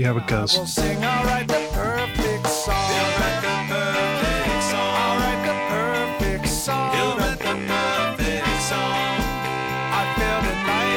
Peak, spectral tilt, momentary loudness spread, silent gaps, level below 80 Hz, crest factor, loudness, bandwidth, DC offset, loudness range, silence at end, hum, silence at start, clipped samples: -6 dBFS; -4 dB/octave; 3 LU; none; -34 dBFS; 16 dB; -22 LUFS; 19 kHz; under 0.1%; 1 LU; 0 s; none; 0 s; under 0.1%